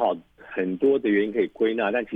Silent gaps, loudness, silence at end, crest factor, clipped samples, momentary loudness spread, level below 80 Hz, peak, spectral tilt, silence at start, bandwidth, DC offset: none; -24 LUFS; 0 s; 14 dB; under 0.1%; 9 LU; -64 dBFS; -10 dBFS; -8 dB/octave; 0 s; 3.8 kHz; under 0.1%